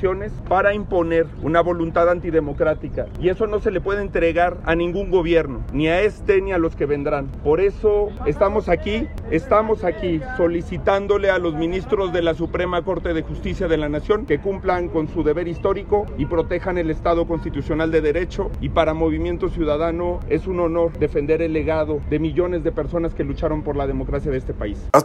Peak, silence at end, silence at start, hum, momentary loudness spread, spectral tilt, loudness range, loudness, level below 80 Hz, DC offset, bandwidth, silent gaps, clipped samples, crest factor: 0 dBFS; 0 s; 0 s; none; 6 LU; -7.5 dB/octave; 2 LU; -21 LUFS; -32 dBFS; under 0.1%; 13 kHz; none; under 0.1%; 20 dB